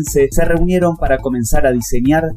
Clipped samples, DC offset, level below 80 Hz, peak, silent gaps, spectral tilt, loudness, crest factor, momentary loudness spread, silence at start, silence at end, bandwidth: under 0.1%; under 0.1%; -20 dBFS; -2 dBFS; none; -6 dB/octave; -15 LUFS; 10 dB; 2 LU; 0 s; 0 s; 16 kHz